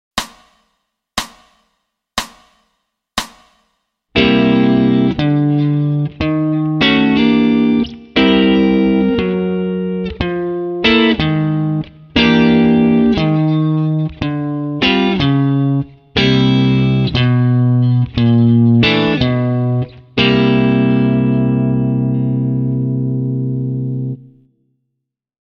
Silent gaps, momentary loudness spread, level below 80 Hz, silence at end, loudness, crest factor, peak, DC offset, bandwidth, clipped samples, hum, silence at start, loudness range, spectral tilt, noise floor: none; 10 LU; -38 dBFS; 1.2 s; -14 LUFS; 14 dB; 0 dBFS; under 0.1%; 11.5 kHz; under 0.1%; none; 0.15 s; 6 LU; -7 dB/octave; -76 dBFS